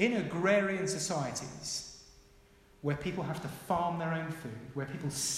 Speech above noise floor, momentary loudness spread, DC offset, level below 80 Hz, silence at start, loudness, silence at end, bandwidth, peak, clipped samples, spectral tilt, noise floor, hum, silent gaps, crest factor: 27 dB; 12 LU; under 0.1%; -62 dBFS; 0 s; -34 LUFS; 0 s; 16 kHz; -16 dBFS; under 0.1%; -4 dB/octave; -61 dBFS; none; none; 18 dB